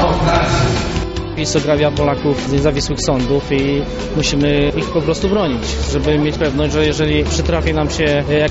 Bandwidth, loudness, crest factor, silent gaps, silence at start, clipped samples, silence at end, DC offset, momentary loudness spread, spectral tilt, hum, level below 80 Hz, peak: 8 kHz; -16 LUFS; 14 dB; none; 0 s; under 0.1%; 0 s; under 0.1%; 4 LU; -5 dB/octave; none; -26 dBFS; 0 dBFS